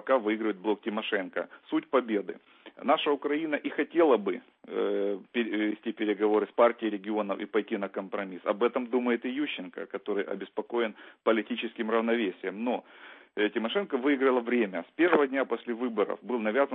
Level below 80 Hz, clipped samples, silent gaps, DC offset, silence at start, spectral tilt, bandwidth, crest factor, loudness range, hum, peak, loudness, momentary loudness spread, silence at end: -86 dBFS; under 0.1%; none; under 0.1%; 0.05 s; -9 dB/octave; 4.1 kHz; 20 dB; 3 LU; none; -10 dBFS; -29 LUFS; 10 LU; 0 s